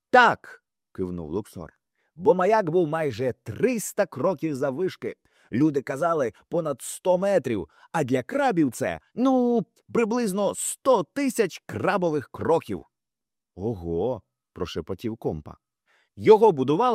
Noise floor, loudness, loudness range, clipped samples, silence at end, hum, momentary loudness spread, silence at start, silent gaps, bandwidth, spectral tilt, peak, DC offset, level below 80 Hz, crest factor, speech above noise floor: -90 dBFS; -25 LUFS; 5 LU; under 0.1%; 0 s; none; 13 LU; 0.15 s; none; 15.5 kHz; -5.5 dB/octave; -4 dBFS; under 0.1%; -60 dBFS; 20 dB; 66 dB